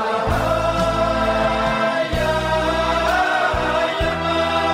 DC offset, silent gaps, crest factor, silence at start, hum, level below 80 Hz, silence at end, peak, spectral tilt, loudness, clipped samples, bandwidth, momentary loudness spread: under 0.1%; none; 12 dB; 0 s; none; -32 dBFS; 0 s; -6 dBFS; -5 dB/octave; -19 LUFS; under 0.1%; 16 kHz; 2 LU